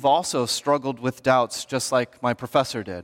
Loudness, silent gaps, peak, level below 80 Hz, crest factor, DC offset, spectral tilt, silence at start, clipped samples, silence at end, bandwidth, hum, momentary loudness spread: -23 LUFS; none; -6 dBFS; -64 dBFS; 18 dB; under 0.1%; -4 dB/octave; 0 s; under 0.1%; 0 s; 17 kHz; none; 6 LU